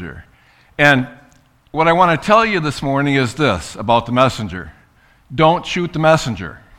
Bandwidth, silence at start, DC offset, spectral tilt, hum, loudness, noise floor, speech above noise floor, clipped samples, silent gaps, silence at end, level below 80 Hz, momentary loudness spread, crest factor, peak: 15 kHz; 0 s; under 0.1%; -5.5 dB/octave; none; -15 LUFS; -52 dBFS; 37 dB; under 0.1%; none; 0.2 s; -42 dBFS; 15 LU; 16 dB; 0 dBFS